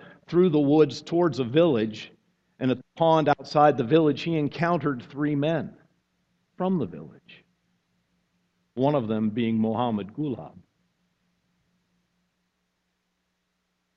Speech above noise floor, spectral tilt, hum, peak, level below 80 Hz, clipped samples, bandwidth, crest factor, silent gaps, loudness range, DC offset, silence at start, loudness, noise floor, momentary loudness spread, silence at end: 53 dB; -8 dB/octave; none; -6 dBFS; -64 dBFS; under 0.1%; 7.6 kHz; 22 dB; none; 11 LU; under 0.1%; 0 s; -24 LUFS; -76 dBFS; 11 LU; 3.5 s